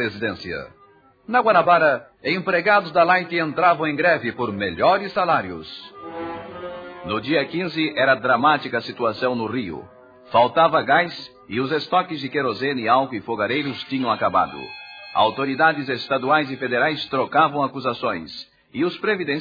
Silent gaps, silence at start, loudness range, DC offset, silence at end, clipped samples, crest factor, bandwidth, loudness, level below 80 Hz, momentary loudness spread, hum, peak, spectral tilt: none; 0 s; 4 LU; under 0.1%; 0 s; under 0.1%; 18 dB; 5 kHz; -20 LUFS; -60 dBFS; 15 LU; none; -4 dBFS; -7 dB/octave